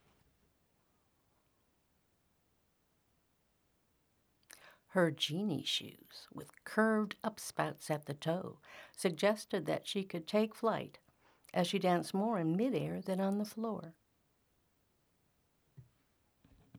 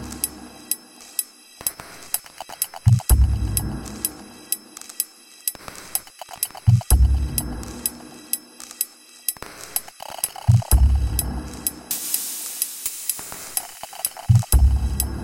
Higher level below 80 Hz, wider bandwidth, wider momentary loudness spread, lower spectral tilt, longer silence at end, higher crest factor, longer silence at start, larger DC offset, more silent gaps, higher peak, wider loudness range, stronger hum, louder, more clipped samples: second, -80 dBFS vs -26 dBFS; first, over 20 kHz vs 17 kHz; first, 18 LU vs 12 LU; about the same, -5 dB/octave vs -4 dB/octave; about the same, 0 s vs 0 s; about the same, 22 dB vs 22 dB; first, 4.65 s vs 0 s; neither; neither; second, -16 dBFS vs 0 dBFS; first, 7 LU vs 4 LU; neither; second, -36 LUFS vs -23 LUFS; neither